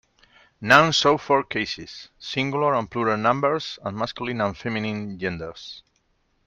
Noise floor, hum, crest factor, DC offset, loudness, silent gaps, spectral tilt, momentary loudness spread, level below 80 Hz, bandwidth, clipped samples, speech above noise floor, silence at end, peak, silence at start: -68 dBFS; none; 24 dB; under 0.1%; -22 LUFS; none; -4.5 dB/octave; 19 LU; -58 dBFS; 13 kHz; under 0.1%; 45 dB; 0.65 s; 0 dBFS; 0.6 s